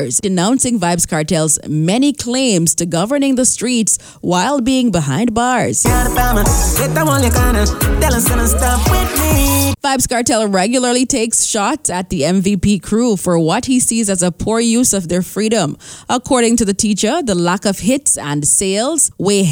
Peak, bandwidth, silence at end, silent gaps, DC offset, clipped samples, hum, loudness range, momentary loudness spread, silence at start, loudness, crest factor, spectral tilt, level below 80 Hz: -2 dBFS; over 20 kHz; 0 s; none; under 0.1%; under 0.1%; none; 1 LU; 3 LU; 0 s; -14 LUFS; 12 dB; -4 dB/octave; -24 dBFS